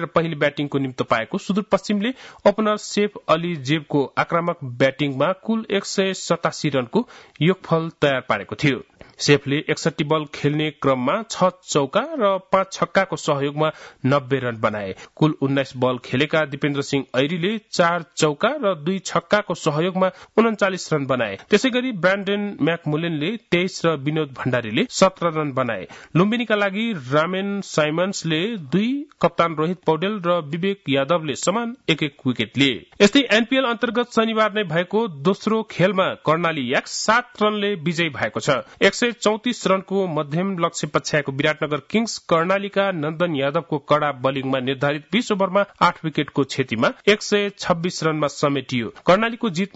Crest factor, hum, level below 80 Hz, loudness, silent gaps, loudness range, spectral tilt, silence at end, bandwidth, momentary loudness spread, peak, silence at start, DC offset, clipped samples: 16 dB; none; -60 dBFS; -21 LUFS; none; 2 LU; -5 dB/octave; 0.1 s; 8.2 kHz; 5 LU; -4 dBFS; 0 s; under 0.1%; under 0.1%